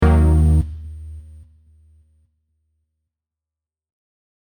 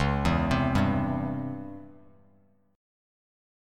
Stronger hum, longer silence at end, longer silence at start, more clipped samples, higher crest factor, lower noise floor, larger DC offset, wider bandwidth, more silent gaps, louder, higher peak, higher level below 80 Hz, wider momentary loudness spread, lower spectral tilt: neither; first, 3.3 s vs 1.85 s; about the same, 0 s vs 0 s; neither; about the same, 18 dB vs 18 dB; first, -89 dBFS vs -64 dBFS; neither; second, 9.4 kHz vs 13 kHz; neither; first, -17 LUFS vs -27 LUFS; first, -2 dBFS vs -12 dBFS; first, -24 dBFS vs -40 dBFS; first, 23 LU vs 16 LU; first, -9 dB/octave vs -7 dB/octave